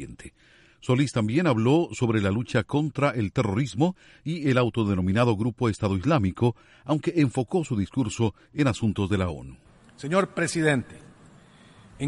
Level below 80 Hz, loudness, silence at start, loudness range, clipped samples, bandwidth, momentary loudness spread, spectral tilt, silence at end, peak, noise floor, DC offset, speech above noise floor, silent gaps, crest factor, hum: -52 dBFS; -25 LUFS; 0 s; 3 LU; under 0.1%; 11.5 kHz; 6 LU; -6.5 dB/octave; 0 s; -8 dBFS; -53 dBFS; under 0.1%; 28 dB; none; 18 dB; none